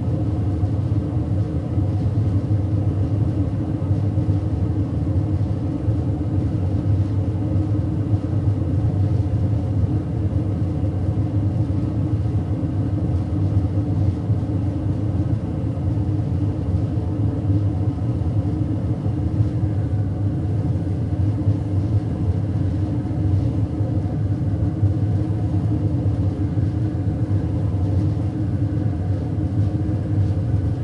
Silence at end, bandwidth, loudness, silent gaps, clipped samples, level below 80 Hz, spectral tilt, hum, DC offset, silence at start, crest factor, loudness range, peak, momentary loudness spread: 0 s; 5.4 kHz; -22 LUFS; none; under 0.1%; -34 dBFS; -10.5 dB/octave; none; under 0.1%; 0 s; 12 dB; 1 LU; -8 dBFS; 2 LU